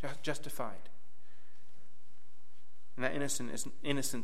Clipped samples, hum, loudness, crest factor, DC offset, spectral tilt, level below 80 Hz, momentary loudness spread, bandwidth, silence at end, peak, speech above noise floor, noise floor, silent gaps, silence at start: under 0.1%; none; -38 LUFS; 26 dB; 3%; -3.5 dB/octave; -74 dBFS; 9 LU; 16.5 kHz; 0 s; -18 dBFS; 31 dB; -70 dBFS; none; 0 s